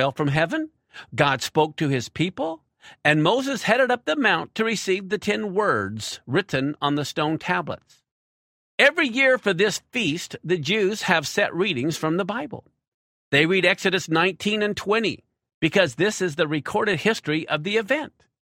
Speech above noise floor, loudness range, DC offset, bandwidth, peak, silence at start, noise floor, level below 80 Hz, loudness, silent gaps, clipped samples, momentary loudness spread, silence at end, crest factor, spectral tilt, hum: over 67 dB; 3 LU; under 0.1%; 16 kHz; -2 dBFS; 0 s; under -90 dBFS; -62 dBFS; -22 LUFS; 8.11-8.78 s, 12.88-13.31 s, 15.54-15.61 s; under 0.1%; 10 LU; 0.35 s; 20 dB; -4.5 dB/octave; none